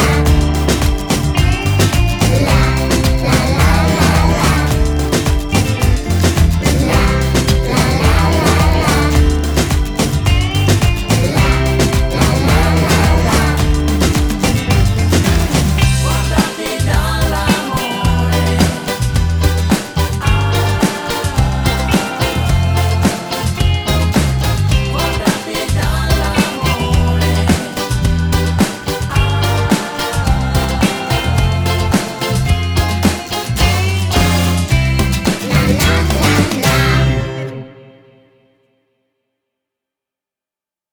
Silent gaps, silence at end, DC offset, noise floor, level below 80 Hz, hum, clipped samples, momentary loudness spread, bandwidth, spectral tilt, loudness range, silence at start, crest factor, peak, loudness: none; 3.15 s; under 0.1%; -89 dBFS; -18 dBFS; none; under 0.1%; 4 LU; over 20 kHz; -5 dB/octave; 3 LU; 0 s; 14 dB; 0 dBFS; -14 LUFS